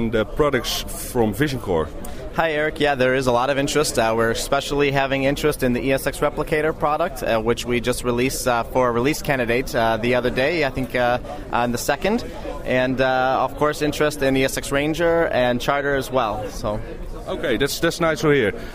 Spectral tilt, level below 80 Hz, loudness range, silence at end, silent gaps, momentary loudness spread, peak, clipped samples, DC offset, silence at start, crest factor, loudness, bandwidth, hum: -4.5 dB/octave; -36 dBFS; 2 LU; 0 s; none; 6 LU; -4 dBFS; under 0.1%; under 0.1%; 0 s; 18 dB; -21 LUFS; 16 kHz; none